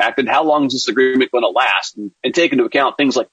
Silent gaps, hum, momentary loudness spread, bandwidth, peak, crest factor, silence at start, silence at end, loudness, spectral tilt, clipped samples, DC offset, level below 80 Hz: none; none; 4 LU; 8.8 kHz; -2 dBFS; 14 dB; 0 s; 0.1 s; -15 LUFS; -3.5 dB/octave; under 0.1%; under 0.1%; -66 dBFS